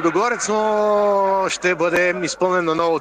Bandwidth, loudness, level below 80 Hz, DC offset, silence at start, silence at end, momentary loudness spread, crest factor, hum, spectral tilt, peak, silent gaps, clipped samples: 15 kHz; -18 LUFS; -56 dBFS; under 0.1%; 0 s; 0 s; 3 LU; 12 dB; none; -4 dB/octave; -6 dBFS; none; under 0.1%